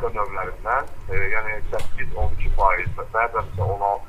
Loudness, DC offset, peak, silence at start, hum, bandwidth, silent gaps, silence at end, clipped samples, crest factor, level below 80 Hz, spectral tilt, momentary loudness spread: -25 LUFS; under 0.1%; -4 dBFS; 0 s; none; 4.6 kHz; none; 0 s; under 0.1%; 16 dB; -28 dBFS; -6.5 dB/octave; 9 LU